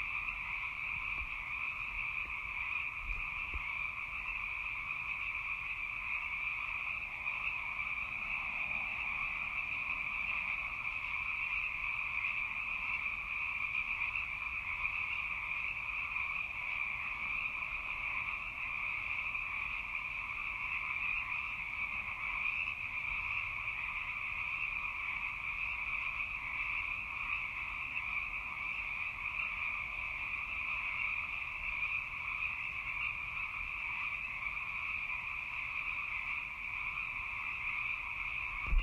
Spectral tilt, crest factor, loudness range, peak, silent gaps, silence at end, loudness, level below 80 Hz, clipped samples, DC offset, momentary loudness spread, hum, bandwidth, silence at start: -3 dB/octave; 18 dB; 2 LU; -20 dBFS; none; 0 s; -36 LUFS; -52 dBFS; under 0.1%; under 0.1%; 3 LU; none; 16 kHz; 0 s